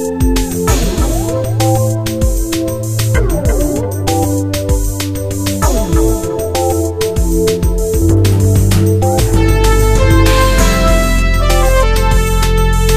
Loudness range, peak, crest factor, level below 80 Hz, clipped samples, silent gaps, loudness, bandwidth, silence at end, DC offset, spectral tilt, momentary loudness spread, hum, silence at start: 4 LU; 0 dBFS; 12 dB; -14 dBFS; under 0.1%; none; -13 LUFS; 15.5 kHz; 0 s; under 0.1%; -5.5 dB/octave; 5 LU; none; 0 s